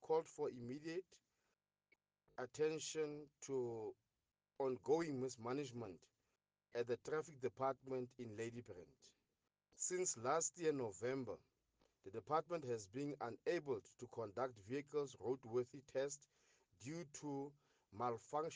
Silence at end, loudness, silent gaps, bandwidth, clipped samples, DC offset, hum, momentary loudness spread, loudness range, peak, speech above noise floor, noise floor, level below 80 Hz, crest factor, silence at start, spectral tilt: 0 s; -46 LUFS; none; 10 kHz; under 0.1%; under 0.1%; none; 13 LU; 3 LU; -26 dBFS; over 45 dB; under -90 dBFS; -86 dBFS; 20 dB; 0 s; -4.5 dB/octave